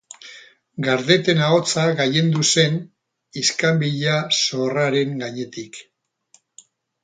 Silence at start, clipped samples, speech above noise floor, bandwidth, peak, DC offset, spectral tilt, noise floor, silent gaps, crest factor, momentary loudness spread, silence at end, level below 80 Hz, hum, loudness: 0.25 s; under 0.1%; 39 dB; 9.6 kHz; -2 dBFS; under 0.1%; -4 dB/octave; -59 dBFS; none; 20 dB; 20 LU; 1.2 s; -64 dBFS; none; -19 LUFS